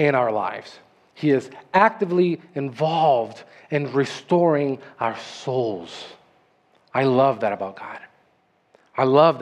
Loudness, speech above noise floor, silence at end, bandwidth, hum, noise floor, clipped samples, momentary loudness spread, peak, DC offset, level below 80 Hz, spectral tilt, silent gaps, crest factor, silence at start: -22 LUFS; 42 dB; 0 s; 10 kHz; none; -63 dBFS; under 0.1%; 15 LU; -2 dBFS; under 0.1%; -74 dBFS; -7 dB/octave; none; 20 dB; 0 s